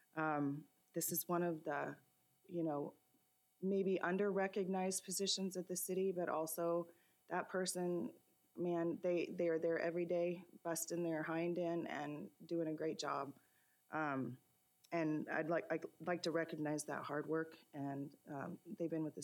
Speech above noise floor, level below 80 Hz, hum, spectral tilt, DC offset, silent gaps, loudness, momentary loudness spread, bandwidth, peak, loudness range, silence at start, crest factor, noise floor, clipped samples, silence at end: 37 dB; under -90 dBFS; none; -4.5 dB/octave; under 0.1%; none; -42 LUFS; 10 LU; 18 kHz; -26 dBFS; 4 LU; 0.15 s; 16 dB; -78 dBFS; under 0.1%; 0 s